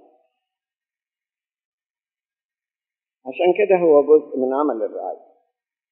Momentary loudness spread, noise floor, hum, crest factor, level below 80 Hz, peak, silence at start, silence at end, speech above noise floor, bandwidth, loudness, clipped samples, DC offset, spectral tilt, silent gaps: 20 LU; under -90 dBFS; none; 20 dB; under -90 dBFS; -4 dBFS; 3.25 s; 0.75 s; over 73 dB; 3.5 kHz; -18 LUFS; under 0.1%; under 0.1%; -5 dB/octave; none